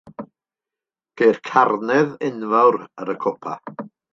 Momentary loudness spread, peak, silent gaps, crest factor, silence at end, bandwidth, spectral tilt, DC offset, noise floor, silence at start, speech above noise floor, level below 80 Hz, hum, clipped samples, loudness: 19 LU; -2 dBFS; none; 20 dB; 0.25 s; 7.2 kHz; -6.5 dB/octave; under 0.1%; -89 dBFS; 0.05 s; 70 dB; -72 dBFS; none; under 0.1%; -19 LUFS